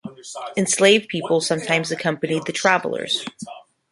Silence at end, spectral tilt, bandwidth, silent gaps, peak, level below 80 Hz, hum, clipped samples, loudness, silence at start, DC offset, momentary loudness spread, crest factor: 0.3 s; -3 dB/octave; 11.5 kHz; none; -2 dBFS; -66 dBFS; none; under 0.1%; -20 LUFS; 0.05 s; under 0.1%; 18 LU; 20 dB